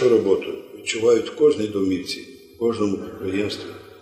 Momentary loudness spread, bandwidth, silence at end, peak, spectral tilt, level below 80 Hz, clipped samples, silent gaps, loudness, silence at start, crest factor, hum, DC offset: 14 LU; 13 kHz; 0.1 s; -6 dBFS; -5 dB/octave; -60 dBFS; under 0.1%; none; -22 LUFS; 0 s; 16 dB; none; under 0.1%